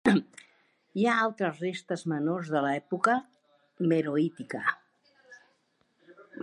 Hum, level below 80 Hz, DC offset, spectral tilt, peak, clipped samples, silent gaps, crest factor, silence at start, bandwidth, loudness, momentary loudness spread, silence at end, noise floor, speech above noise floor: none; -74 dBFS; under 0.1%; -6.5 dB/octave; -10 dBFS; under 0.1%; none; 20 dB; 0.05 s; 11.5 kHz; -29 LUFS; 9 LU; 0 s; -72 dBFS; 43 dB